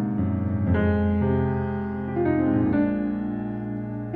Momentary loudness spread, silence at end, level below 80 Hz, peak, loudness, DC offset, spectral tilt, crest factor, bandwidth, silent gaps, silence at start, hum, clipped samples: 8 LU; 0 s; -42 dBFS; -10 dBFS; -25 LUFS; under 0.1%; -11.5 dB/octave; 14 dB; 4.3 kHz; none; 0 s; none; under 0.1%